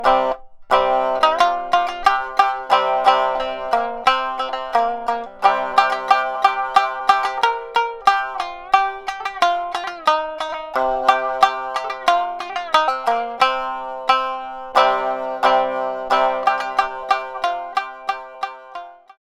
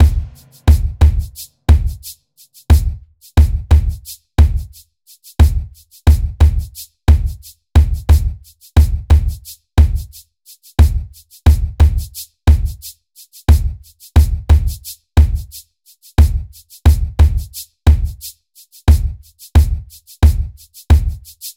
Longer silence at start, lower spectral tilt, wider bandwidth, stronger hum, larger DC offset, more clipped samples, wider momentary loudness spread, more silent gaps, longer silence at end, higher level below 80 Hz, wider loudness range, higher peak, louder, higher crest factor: about the same, 0 s vs 0 s; second, -2 dB/octave vs -6.5 dB/octave; second, 13.5 kHz vs 16 kHz; neither; neither; neither; second, 9 LU vs 17 LU; neither; first, 0.4 s vs 0.05 s; second, -50 dBFS vs -16 dBFS; about the same, 3 LU vs 2 LU; about the same, 0 dBFS vs 0 dBFS; second, -19 LUFS vs -16 LUFS; first, 20 dB vs 14 dB